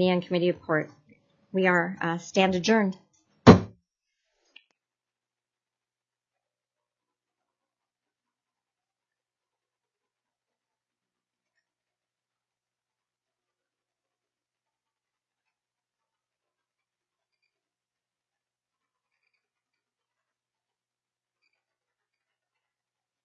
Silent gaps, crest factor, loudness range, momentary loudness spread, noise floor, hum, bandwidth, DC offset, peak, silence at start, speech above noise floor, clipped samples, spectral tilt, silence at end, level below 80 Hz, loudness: none; 30 dB; 3 LU; 14 LU; under -90 dBFS; none; 7.4 kHz; under 0.1%; 0 dBFS; 0 s; over 65 dB; under 0.1%; -6.5 dB/octave; 19.6 s; -56 dBFS; -23 LUFS